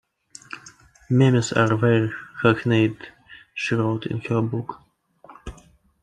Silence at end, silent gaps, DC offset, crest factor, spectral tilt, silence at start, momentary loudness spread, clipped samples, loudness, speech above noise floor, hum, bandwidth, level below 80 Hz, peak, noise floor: 0.5 s; none; under 0.1%; 20 dB; -6.5 dB/octave; 0.5 s; 22 LU; under 0.1%; -21 LUFS; 33 dB; none; 9.8 kHz; -54 dBFS; -4 dBFS; -53 dBFS